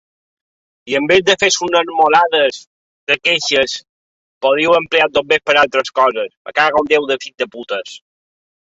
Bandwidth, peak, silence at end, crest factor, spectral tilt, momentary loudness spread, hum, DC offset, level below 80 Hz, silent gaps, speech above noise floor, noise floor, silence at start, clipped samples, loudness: 8 kHz; 0 dBFS; 0.75 s; 16 dB; -2 dB/octave; 12 LU; none; under 0.1%; -56 dBFS; 2.67-3.07 s, 3.89-4.41 s, 6.37-6.45 s; over 75 dB; under -90 dBFS; 0.85 s; under 0.1%; -14 LUFS